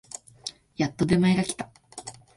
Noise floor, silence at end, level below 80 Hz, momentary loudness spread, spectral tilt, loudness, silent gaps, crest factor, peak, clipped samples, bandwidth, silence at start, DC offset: -44 dBFS; 0.25 s; -54 dBFS; 19 LU; -5.5 dB/octave; -25 LUFS; none; 18 dB; -10 dBFS; under 0.1%; 11.5 kHz; 0.45 s; under 0.1%